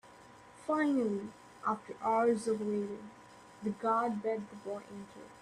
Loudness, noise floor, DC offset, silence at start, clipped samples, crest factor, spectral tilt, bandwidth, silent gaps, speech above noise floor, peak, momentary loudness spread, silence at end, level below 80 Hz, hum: -34 LUFS; -56 dBFS; under 0.1%; 0.05 s; under 0.1%; 16 dB; -6.5 dB/octave; 12.5 kHz; none; 22 dB; -18 dBFS; 18 LU; 0 s; -76 dBFS; none